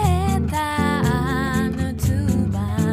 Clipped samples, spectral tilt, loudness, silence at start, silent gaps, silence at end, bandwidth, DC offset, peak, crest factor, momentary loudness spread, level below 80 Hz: under 0.1%; -6.5 dB/octave; -21 LUFS; 0 s; none; 0 s; 15.5 kHz; under 0.1%; -6 dBFS; 14 dB; 3 LU; -30 dBFS